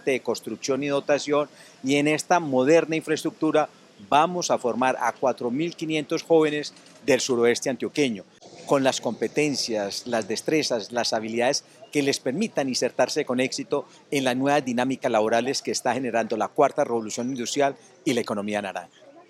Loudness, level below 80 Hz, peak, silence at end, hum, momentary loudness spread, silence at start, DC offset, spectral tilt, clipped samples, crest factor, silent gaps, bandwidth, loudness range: -24 LUFS; -74 dBFS; -4 dBFS; 0.2 s; none; 8 LU; 0.05 s; under 0.1%; -4 dB/octave; under 0.1%; 20 dB; none; 15 kHz; 2 LU